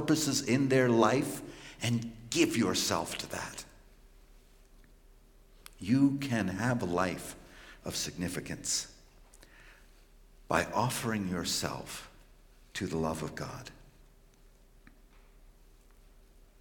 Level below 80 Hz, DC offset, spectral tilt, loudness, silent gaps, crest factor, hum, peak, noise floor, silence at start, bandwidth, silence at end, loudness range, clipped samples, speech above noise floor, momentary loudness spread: -58 dBFS; under 0.1%; -4.5 dB/octave; -32 LUFS; none; 24 dB; none; -10 dBFS; -59 dBFS; 0 s; 17 kHz; 1.4 s; 11 LU; under 0.1%; 28 dB; 18 LU